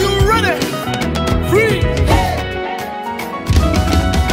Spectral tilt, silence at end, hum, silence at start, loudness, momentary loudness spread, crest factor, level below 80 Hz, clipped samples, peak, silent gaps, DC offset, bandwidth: -5.5 dB/octave; 0 s; none; 0 s; -16 LUFS; 10 LU; 14 dB; -22 dBFS; under 0.1%; 0 dBFS; none; under 0.1%; 16.5 kHz